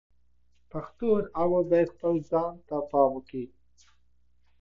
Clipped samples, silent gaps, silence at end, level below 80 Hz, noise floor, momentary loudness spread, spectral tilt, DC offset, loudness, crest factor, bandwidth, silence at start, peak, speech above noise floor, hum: under 0.1%; none; 1.15 s; -58 dBFS; -70 dBFS; 15 LU; -9.5 dB/octave; under 0.1%; -27 LUFS; 20 dB; 7 kHz; 0.75 s; -10 dBFS; 43 dB; none